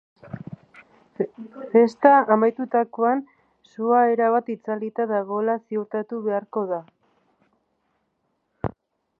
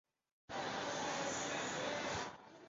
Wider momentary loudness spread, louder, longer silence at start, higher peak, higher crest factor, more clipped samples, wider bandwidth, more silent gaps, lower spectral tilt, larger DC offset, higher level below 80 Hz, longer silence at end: first, 17 LU vs 5 LU; first, -22 LUFS vs -41 LUFS; second, 0.25 s vs 0.5 s; first, -2 dBFS vs -28 dBFS; first, 22 dB vs 14 dB; neither; second, 6.6 kHz vs 7.6 kHz; neither; first, -8.5 dB/octave vs -2 dB/octave; neither; first, -60 dBFS vs -70 dBFS; first, 0.5 s vs 0 s